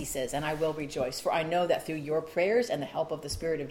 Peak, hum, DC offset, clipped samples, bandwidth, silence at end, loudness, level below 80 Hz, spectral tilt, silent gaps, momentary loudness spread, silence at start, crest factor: -14 dBFS; none; under 0.1%; under 0.1%; 17 kHz; 0 s; -30 LUFS; -54 dBFS; -4.5 dB/octave; none; 6 LU; 0 s; 16 dB